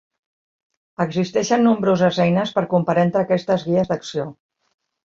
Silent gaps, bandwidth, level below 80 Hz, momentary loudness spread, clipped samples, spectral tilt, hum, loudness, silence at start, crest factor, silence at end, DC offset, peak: none; 7.6 kHz; -58 dBFS; 10 LU; under 0.1%; -6.5 dB/octave; none; -19 LUFS; 1 s; 16 dB; 0.8 s; under 0.1%; -4 dBFS